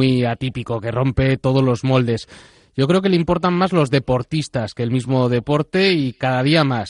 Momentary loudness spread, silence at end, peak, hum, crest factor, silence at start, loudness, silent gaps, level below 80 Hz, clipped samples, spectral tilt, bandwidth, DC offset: 8 LU; 0 s; -2 dBFS; none; 14 dB; 0 s; -18 LUFS; none; -42 dBFS; under 0.1%; -7 dB/octave; 11 kHz; under 0.1%